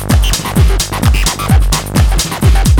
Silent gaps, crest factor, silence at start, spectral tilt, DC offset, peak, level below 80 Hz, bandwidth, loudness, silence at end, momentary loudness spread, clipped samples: none; 10 dB; 0 s; -4.5 dB/octave; under 0.1%; 0 dBFS; -12 dBFS; over 20 kHz; -12 LUFS; 0 s; 2 LU; under 0.1%